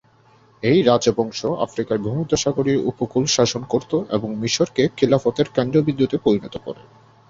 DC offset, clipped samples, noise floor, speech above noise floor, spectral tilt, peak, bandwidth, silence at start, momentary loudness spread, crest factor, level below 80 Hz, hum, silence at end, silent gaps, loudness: under 0.1%; under 0.1%; -54 dBFS; 34 dB; -5 dB/octave; -2 dBFS; 7.8 kHz; 0.65 s; 7 LU; 18 dB; -52 dBFS; none; 0.45 s; none; -20 LUFS